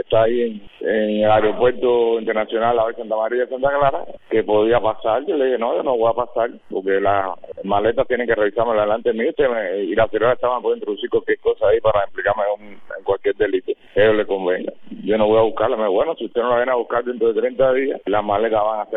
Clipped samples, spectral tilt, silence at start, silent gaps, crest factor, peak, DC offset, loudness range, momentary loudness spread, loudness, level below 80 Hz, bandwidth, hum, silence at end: under 0.1%; -9.5 dB/octave; 0.1 s; none; 14 dB; -4 dBFS; under 0.1%; 2 LU; 7 LU; -19 LUFS; -46 dBFS; 4 kHz; none; 0 s